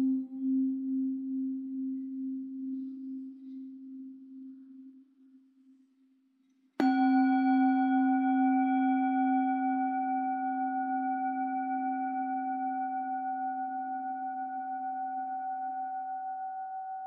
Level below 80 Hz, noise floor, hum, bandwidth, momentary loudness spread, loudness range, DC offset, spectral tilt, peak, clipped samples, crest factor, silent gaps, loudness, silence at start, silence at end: under -90 dBFS; -69 dBFS; none; 4.7 kHz; 18 LU; 16 LU; under 0.1%; -3.5 dB/octave; -14 dBFS; under 0.1%; 18 dB; none; -31 LUFS; 0 s; 0 s